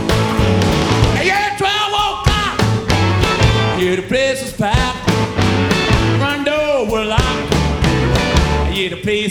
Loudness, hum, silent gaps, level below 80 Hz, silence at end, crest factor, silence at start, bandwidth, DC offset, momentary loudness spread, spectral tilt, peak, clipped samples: -15 LUFS; none; none; -24 dBFS; 0 s; 14 dB; 0 s; 17 kHz; under 0.1%; 3 LU; -5 dB/octave; 0 dBFS; under 0.1%